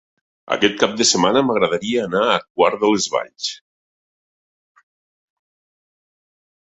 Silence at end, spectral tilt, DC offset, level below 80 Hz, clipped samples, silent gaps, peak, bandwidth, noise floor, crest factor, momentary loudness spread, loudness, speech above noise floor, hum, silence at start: 3.1 s; -3 dB/octave; under 0.1%; -60 dBFS; under 0.1%; 2.50-2.55 s; 0 dBFS; 8.4 kHz; under -90 dBFS; 22 dB; 11 LU; -18 LUFS; over 72 dB; none; 0.5 s